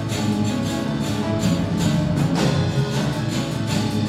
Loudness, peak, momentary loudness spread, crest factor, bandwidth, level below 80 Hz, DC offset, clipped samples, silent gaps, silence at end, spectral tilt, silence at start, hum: -22 LUFS; -6 dBFS; 4 LU; 14 dB; 15 kHz; -42 dBFS; under 0.1%; under 0.1%; none; 0 s; -6 dB/octave; 0 s; none